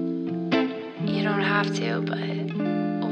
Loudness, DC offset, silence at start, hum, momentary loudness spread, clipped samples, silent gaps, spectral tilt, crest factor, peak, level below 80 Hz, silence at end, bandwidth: -26 LUFS; under 0.1%; 0 s; none; 6 LU; under 0.1%; none; -6.5 dB/octave; 16 dB; -10 dBFS; -68 dBFS; 0 s; 8.6 kHz